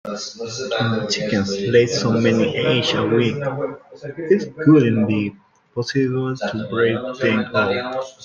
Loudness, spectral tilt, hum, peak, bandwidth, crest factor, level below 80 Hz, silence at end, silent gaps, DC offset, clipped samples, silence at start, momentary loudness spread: -19 LUFS; -5.5 dB/octave; none; -2 dBFS; 7.6 kHz; 16 dB; -58 dBFS; 0 s; none; under 0.1%; under 0.1%; 0.05 s; 12 LU